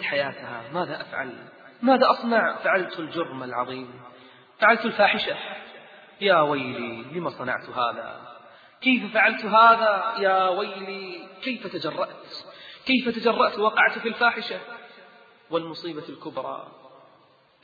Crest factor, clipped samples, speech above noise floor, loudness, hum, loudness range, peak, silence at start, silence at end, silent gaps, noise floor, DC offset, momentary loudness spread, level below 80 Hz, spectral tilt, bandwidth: 22 dB; under 0.1%; 34 dB; -23 LUFS; none; 6 LU; -4 dBFS; 0 s; 0.75 s; none; -58 dBFS; under 0.1%; 17 LU; -72 dBFS; -6.5 dB/octave; 7 kHz